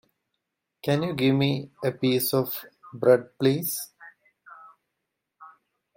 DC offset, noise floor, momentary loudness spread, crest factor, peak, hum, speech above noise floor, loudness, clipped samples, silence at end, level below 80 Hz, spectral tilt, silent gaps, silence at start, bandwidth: under 0.1%; -82 dBFS; 12 LU; 22 dB; -6 dBFS; none; 58 dB; -25 LUFS; under 0.1%; 0.5 s; -68 dBFS; -5.5 dB/octave; none; 0.85 s; 16.5 kHz